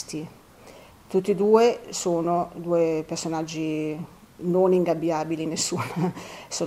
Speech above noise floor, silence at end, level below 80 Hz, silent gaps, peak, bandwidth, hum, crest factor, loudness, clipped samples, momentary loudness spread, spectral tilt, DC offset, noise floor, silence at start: 24 dB; 0 s; -62 dBFS; none; -4 dBFS; 15.5 kHz; none; 20 dB; -24 LUFS; under 0.1%; 14 LU; -5 dB/octave; under 0.1%; -48 dBFS; 0 s